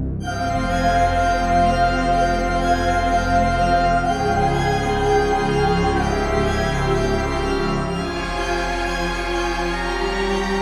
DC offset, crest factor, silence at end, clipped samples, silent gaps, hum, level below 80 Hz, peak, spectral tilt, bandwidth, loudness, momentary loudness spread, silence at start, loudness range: under 0.1%; 14 dB; 0 s; under 0.1%; none; none; -28 dBFS; -6 dBFS; -5.5 dB/octave; 14.5 kHz; -20 LUFS; 5 LU; 0 s; 4 LU